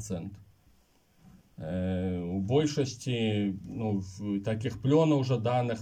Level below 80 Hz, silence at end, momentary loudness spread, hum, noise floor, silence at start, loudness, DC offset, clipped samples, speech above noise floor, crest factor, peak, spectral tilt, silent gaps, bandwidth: -62 dBFS; 0 s; 11 LU; none; -65 dBFS; 0 s; -30 LUFS; under 0.1%; under 0.1%; 36 dB; 18 dB; -12 dBFS; -7 dB/octave; none; 10.5 kHz